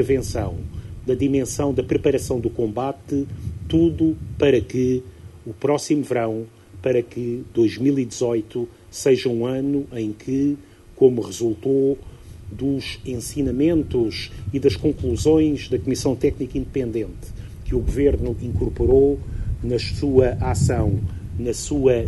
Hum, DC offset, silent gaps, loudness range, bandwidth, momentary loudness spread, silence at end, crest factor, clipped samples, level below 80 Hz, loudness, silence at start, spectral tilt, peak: none; under 0.1%; none; 2 LU; 12 kHz; 12 LU; 0 s; 20 dB; under 0.1%; -34 dBFS; -22 LUFS; 0 s; -6.5 dB/octave; -2 dBFS